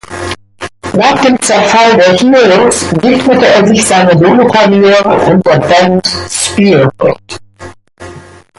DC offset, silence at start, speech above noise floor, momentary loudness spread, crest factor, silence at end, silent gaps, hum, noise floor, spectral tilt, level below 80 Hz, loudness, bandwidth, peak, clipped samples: under 0.1%; 0.1 s; 25 dB; 14 LU; 8 dB; 0.4 s; none; none; -32 dBFS; -4.5 dB/octave; -38 dBFS; -7 LUFS; 11.5 kHz; 0 dBFS; under 0.1%